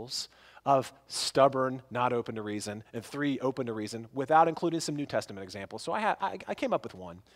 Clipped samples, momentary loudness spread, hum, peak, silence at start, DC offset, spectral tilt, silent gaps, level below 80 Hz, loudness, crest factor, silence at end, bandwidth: under 0.1%; 15 LU; none; -10 dBFS; 0 s; under 0.1%; -4.5 dB/octave; none; -70 dBFS; -31 LUFS; 20 dB; 0.15 s; 16 kHz